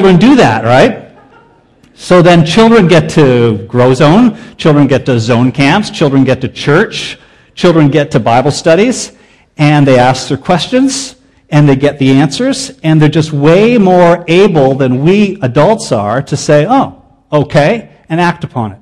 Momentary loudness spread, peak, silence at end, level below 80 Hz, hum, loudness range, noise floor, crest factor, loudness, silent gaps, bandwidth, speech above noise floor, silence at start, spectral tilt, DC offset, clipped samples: 8 LU; 0 dBFS; 0.05 s; -40 dBFS; none; 3 LU; -44 dBFS; 8 dB; -8 LUFS; none; 12 kHz; 37 dB; 0 s; -6 dB/octave; 0.8%; 1%